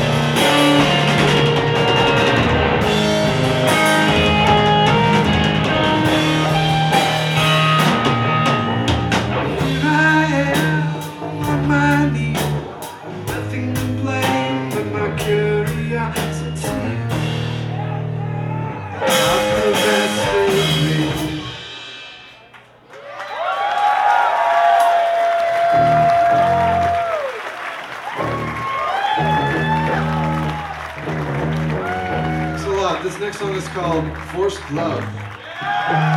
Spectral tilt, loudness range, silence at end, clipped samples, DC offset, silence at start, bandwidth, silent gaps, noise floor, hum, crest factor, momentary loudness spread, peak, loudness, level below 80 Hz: -5 dB/octave; 7 LU; 0 s; under 0.1%; under 0.1%; 0 s; 17.5 kHz; none; -44 dBFS; none; 16 dB; 12 LU; -2 dBFS; -17 LUFS; -38 dBFS